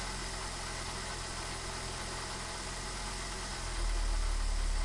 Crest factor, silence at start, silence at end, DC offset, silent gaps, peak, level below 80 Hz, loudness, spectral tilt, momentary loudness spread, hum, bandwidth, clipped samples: 12 dB; 0 s; 0 s; under 0.1%; none; -24 dBFS; -38 dBFS; -38 LUFS; -2.5 dB/octave; 2 LU; none; 11.5 kHz; under 0.1%